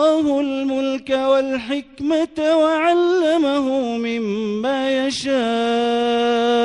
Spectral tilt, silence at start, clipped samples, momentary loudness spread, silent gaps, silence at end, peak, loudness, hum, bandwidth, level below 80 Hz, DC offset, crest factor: -4.5 dB/octave; 0 s; under 0.1%; 6 LU; none; 0 s; -6 dBFS; -19 LUFS; none; 11 kHz; -58 dBFS; under 0.1%; 12 dB